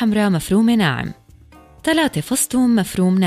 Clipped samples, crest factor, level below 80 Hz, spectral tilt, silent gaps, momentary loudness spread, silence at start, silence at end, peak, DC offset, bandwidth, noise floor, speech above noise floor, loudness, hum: under 0.1%; 12 dB; -46 dBFS; -5 dB/octave; none; 7 LU; 0 s; 0 s; -4 dBFS; under 0.1%; 15.5 kHz; -46 dBFS; 29 dB; -17 LUFS; none